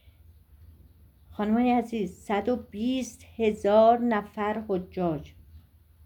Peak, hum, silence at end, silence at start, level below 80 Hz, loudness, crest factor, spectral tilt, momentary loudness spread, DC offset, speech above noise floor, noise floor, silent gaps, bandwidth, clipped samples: -10 dBFS; none; 0.45 s; 1.3 s; -56 dBFS; -26 LUFS; 18 dB; -6.5 dB/octave; 12 LU; under 0.1%; 29 dB; -55 dBFS; none; 19 kHz; under 0.1%